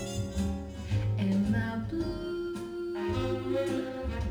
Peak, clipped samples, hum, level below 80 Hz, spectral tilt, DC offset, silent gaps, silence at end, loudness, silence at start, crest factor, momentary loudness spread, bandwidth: -18 dBFS; under 0.1%; none; -42 dBFS; -7 dB/octave; under 0.1%; none; 0 s; -32 LUFS; 0 s; 12 dB; 7 LU; 15 kHz